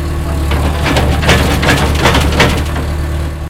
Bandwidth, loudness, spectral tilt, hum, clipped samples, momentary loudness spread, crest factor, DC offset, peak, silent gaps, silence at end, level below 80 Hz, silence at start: 16.5 kHz; -12 LUFS; -5 dB/octave; none; 0.1%; 7 LU; 12 dB; under 0.1%; 0 dBFS; none; 0 s; -16 dBFS; 0 s